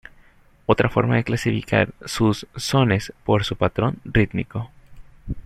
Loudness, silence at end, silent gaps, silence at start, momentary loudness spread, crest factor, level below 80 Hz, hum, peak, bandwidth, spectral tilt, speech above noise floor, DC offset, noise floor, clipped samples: -21 LUFS; 0.05 s; none; 0.7 s; 11 LU; 20 dB; -40 dBFS; none; -2 dBFS; 14 kHz; -6 dB/octave; 32 dB; under 0.1%; -52 dBFS; under 0.1%